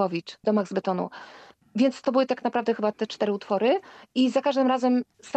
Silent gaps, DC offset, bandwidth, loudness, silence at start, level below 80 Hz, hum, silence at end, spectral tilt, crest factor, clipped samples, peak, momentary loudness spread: none; under 0.1%; 8.6 kHz; -25 LUFS; 0 s; -74 dBFS; none; 0 s; -6 dB/octave; 16 dB; under 0.1%; -10 dBFS; 7 LU